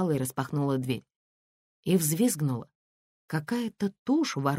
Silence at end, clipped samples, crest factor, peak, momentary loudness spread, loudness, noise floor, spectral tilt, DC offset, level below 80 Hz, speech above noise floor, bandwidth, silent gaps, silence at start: 0 s; under 0.1%; 18 dB; -12 dBFS; 9 LU; -29 LUFS; under -90 dBFS; -5.5 dB/octave; under 0.1%; -68 dBFS; over 62 dB; 16 kHz; 1.16-1.83 s, 2.75-3.28 s, 3.99-4.06 s; 0 s